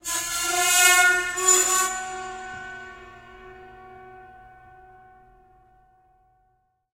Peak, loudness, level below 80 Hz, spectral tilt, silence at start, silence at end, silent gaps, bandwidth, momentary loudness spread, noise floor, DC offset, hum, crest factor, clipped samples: -2 dBFS; -19 LUFS; -58 dBFS; 1 dB/octave; 0.05 s; 2.65 s; none; 16 kHz; 22 LU; -69 dBFS; under 0.1%; none; 24 dB; under 0.1%